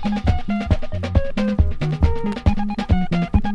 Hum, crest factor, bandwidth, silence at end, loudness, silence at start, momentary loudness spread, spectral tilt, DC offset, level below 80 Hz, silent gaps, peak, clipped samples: none; 16 dB; 7.8 kHz; 0 s; -21 LUFS; 0 s; 3 LU; -8 dB/octave; under 0.1%; -24 dBFS; none; -2 dBFS; under 0.1%